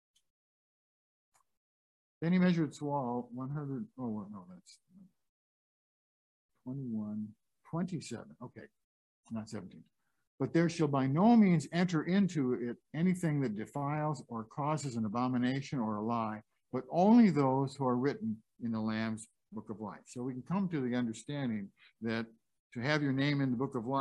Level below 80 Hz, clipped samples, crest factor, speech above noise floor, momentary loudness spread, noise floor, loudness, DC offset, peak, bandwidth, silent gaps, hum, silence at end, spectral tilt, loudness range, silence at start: -74 dBFS; under 0.1%; 20 dB; over 57 dB; 17 LU; under -90 dBFS; -33 LUFS; under 0.1%; -14 dBFS; 11.5 kHz; 5.29-6.49 s, 8.84-9.23 s, 10.27-10.38 s, 22.59-22.70 s; none; 0 s; -7 dB/octave; 13 LU; 2.2 s